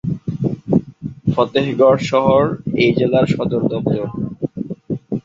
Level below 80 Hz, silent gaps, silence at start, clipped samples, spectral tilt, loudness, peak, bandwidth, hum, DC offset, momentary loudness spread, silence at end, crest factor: -46 dBFS; none; 0.05 s; under 0.1%; -7.5 dB/octave; -17 LUFS; -2 dBFS; 7.8 kHz; none; under 0.1%; 11 LU; 0.05 s; 16 dB